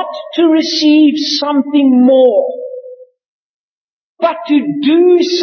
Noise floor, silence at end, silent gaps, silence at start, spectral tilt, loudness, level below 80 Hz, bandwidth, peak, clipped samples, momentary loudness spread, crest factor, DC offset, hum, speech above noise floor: -34 dBFS; 0 s; 3.26-4.16 s; 0 s; -4 dB/octave; -11 LUFS; -74 dBFS; 6.6 kHz; 0 dBFS; under 0.1%; 11 LU; 10 dB; under 0.1%; none; 24 dB